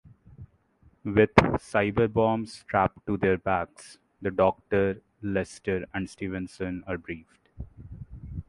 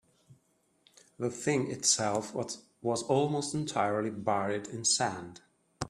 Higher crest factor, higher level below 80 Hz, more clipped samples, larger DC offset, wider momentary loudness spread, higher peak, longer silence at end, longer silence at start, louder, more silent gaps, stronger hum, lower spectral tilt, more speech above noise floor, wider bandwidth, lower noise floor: first, 26 dB vs 20 dB; first, -48 dBFS vs -68 dBFS; neither; neither; first, 20 LU vs 10 LU; first, -2 dBFS vs -12 dBFS; about the same, 0.05 s vs 0 s; about the same, 0.4 s vs 0.3 s; first, -27 LUFS vs -31 LUFS; neither; neither; first, -7 dB/octave vs -3.5 dB/octave; second, 35 dB vs 40 dB; second, 11.5 kHz vs 13 kHz; second, -62 dBFS vs -72 dBFS